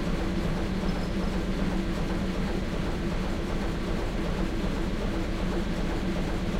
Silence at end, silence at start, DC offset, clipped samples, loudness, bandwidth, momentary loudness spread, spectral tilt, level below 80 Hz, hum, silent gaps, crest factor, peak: 0 s; 0 s; under 0.1%; under 0.1%; -31 LUFS; 15 kHz; 1 LU; -6.5 dB/octave; -32 dBFS; none; none; 14 dB; -14 dBFS